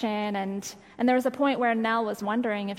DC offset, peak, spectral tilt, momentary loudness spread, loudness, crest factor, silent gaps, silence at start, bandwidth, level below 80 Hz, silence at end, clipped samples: under 0.1%; -12 dBFS; -5 dB/octave; 8 LU; -27 LUFS; 14 dB; none; 0 s; 16 kHz; -70 dBFS; 0 s; under 0.1%